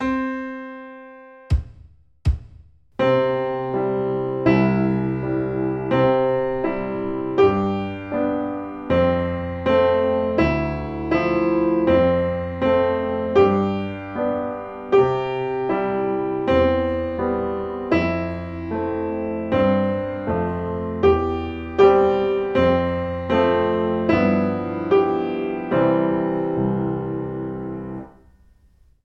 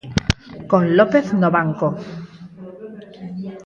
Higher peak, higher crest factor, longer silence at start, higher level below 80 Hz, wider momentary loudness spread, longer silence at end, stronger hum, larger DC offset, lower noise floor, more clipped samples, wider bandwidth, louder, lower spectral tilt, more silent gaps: about the same, -2 dBFS vs 0 dBFS; about the same, 18 dB vs 20 dB; about the same, 0 s vs 0.05 s; about the same, -38 dBFS vs -42 dBFS; second, 10 LU vs 22 LU; first, 0.95 s vs 0.05 s; neither; neither; first, -55 dBFS vs -38 dBFS; neither; second, 6.8 kHz vs 8.8 kHz; second, -21 LUFS vs -18 LUFS; first, -9 dB/octave vs -6.5 dB/octave; neither